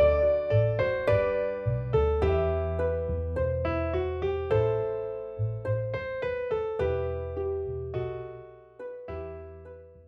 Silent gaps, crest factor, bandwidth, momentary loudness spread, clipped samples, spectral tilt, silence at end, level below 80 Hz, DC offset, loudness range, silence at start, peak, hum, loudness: none; 16 dB; 6 kHz; 15 LU; under 0.1%; -9 dB/octave; 0.05 s; -40 dBFS; under 0.1%; 6 LU; 0 s; -12 dBFS; none; -29 LUFS